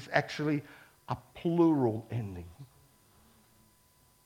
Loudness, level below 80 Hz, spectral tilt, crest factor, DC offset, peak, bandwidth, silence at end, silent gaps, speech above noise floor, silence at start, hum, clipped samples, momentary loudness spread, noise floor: -32 LUFS; -64 dBFS; -7.5 dB/octave; 24 dB; under 0.1%; -10 dBFS; 15.5 kHz; 1.6 s; none; 35 dB; 0 s; none; under 0.1%; 23 LU; -65 dBFS